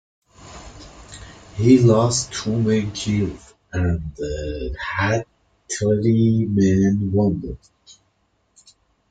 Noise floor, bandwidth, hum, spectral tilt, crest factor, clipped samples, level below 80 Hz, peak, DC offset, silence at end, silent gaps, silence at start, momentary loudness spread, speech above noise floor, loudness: -66 dBFS; 9.4 kHz; none; -6 dB/octave; 18 dB; under 0.1%; -42 dBFS; -2 dBFS; under 0.1%; 1.55 s; none; 0.4 s; 24 LU; 47 dB; -20 LUFS